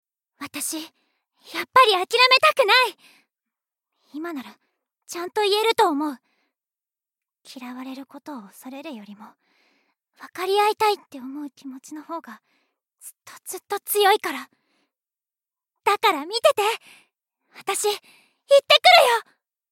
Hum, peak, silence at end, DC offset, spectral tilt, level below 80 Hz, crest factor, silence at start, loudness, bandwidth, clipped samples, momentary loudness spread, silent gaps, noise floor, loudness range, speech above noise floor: none; -2 dBFS; 0.5 s; under 0.1%; -0.5 dB/octave; -84 dBFS; 22 dB; 0.4 s; -19 LUFS; 17 kHz; under 0.1%; 24 LU; none; under -90 dBFS; 15 LU; over 68 dB